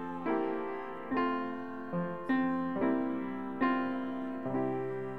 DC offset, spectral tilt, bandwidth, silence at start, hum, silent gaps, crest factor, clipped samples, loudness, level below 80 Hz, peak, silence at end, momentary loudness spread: 0.4%; -9 dB/octave; 5 kHz; 0 s; none; none; 16 dB; under 0.1%; -34 LUFS; -70 dBFS; -18 dBFS; 0 s; 7 LU